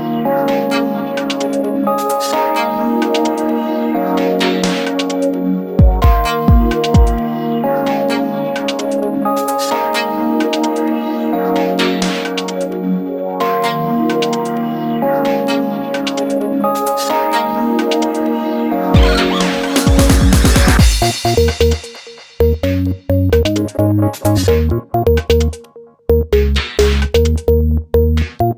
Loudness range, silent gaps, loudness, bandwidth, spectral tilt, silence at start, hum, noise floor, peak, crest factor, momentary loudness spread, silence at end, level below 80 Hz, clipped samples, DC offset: 4 LU; none; -15 LUFS; 19 kHz; -5.5 dB/octave; 0 s; none; -39 dBFS; 0 dBFS; 14 dB; 7 LU; 0 s; -20 dBFS; under 0.1%; under 0.1%